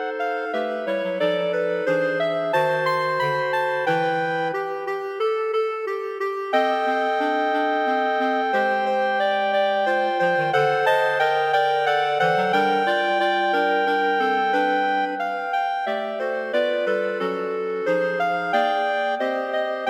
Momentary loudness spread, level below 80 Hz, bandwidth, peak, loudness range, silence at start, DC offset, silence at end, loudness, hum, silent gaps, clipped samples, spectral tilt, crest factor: 6 LU; -78 dBFS; 15 kHz; -6 dBFS; 4 LU; 0 s; under 0.1%; 0 s; -22 LUFS; none; none; under 0.1%; -5 dB/octave; 14 dB